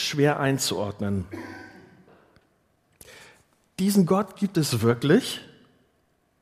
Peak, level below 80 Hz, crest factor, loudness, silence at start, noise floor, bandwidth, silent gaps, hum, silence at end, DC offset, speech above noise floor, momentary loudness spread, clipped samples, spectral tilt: -6 dBFS; -64 dBFS; 20 dB; -24 LUFS; 0 s; -68 dBFS; 15.5 kHz; none; none; 0.95 s; under 0.1%; 44 dB; 18 LU; under 0.1%; -5 dB/octave